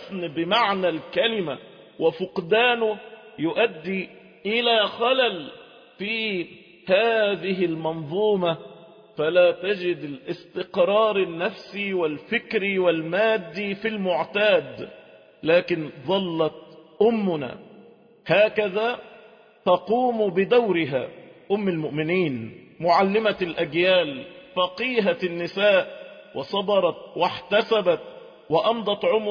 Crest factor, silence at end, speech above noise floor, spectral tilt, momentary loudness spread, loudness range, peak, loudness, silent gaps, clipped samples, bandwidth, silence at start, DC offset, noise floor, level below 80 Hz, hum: 16 dB; 0 s; 28 dB; -7 dB/octave; 14 LU; 2 LU; -8 dBFS; -23 LUFS; none; under 0.1%; 5.2 kHz; 0 s; under 0.1%; -51 dBFS; -66 dBFS; none